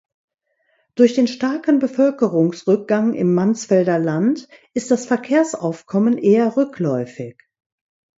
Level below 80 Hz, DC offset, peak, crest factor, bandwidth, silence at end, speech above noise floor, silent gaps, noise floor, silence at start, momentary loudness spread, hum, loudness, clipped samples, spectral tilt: -66 dBFS; under 0.1%; -2 dBFS; 16 dB; 8 kHz; 0.9 s; 49 dB; none; -67 dBFS; 0.95 s; 11 LU; none; -18 LUFS; under 0.1%; -6.5 dB/octave